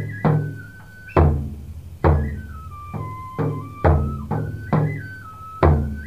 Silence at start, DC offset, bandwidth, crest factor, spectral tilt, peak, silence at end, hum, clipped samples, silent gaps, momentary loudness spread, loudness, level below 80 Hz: 0 s; 0.3%; 5.4 kHz; 18 dB; -9.5 dB/octave; -4 dBFS; 0 s; none; under 0.1%; none; 18 LU; -22 LUFS; -28 dBFS